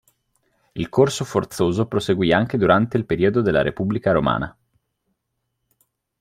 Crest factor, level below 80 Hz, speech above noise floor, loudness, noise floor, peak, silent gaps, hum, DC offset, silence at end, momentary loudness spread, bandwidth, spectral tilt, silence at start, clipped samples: 18 dB; -48 dBFS; 57 dB; -20 LUFS; -76 dBFS; -2 dBFS; none; none; under 0.1%; 1.7 s; 7 LU; 15.5 kHz; -6.5 dB/octave; 0.75 s; under 0.1%